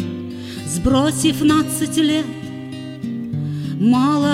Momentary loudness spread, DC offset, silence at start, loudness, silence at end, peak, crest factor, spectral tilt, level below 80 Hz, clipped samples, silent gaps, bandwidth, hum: 14 LU; under 0.1%; 0 s; -19 LUFS; 0 s; -4 dBFS; 16 dB; -5 dB/octave; -40 dBFS; under 0.1%; none; 16 kHz; none